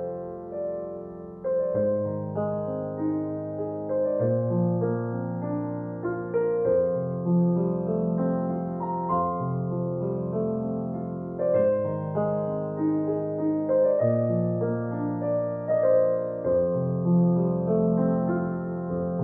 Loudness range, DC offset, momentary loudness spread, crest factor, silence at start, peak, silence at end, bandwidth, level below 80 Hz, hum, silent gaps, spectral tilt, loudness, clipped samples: 4 LU; under 0.1%; 9 LU; 14 dB; 0 s; -12 dBFS; 0 s; 2.5 kHz; -60 dBFS; none; none; -14 dB/octave; -26 LUFS; under 0.1%